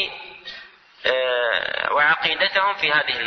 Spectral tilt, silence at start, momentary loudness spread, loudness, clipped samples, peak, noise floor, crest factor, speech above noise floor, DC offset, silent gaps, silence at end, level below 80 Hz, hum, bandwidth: -3 dB/octave; 0 s; 18 LU; -20 LUFS; under 0.1%; -4 dBFS; -44 dBFS; 18 dB; 23 dB; under 0.1%; none; 0 s; -62 dBFS; none; 6.4 kHz